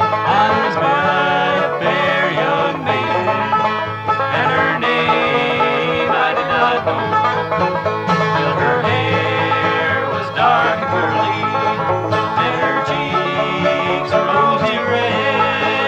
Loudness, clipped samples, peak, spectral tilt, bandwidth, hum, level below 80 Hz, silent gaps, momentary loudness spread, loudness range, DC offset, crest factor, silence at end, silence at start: -16 LUFS; under 0.1%; -2 dBFS; -6 dB/octave; 9.2 kHz; none; -52 dBFS; none; 3 LU; 1 LU; under 0.1%; 14 dB; 0 s; 0 s